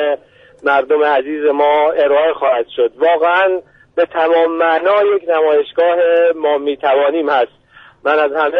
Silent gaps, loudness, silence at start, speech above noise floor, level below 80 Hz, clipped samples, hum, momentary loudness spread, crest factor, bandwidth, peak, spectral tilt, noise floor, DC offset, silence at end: none; -14 LUFS; 0 s; 21 dB; -60 dBFS; under 0.1%; none; 6 LU; 10 dB; 5 kHz; -2 dBFS; -5.5 dB/octave; -34 dBFS; under 0.1%; 0 s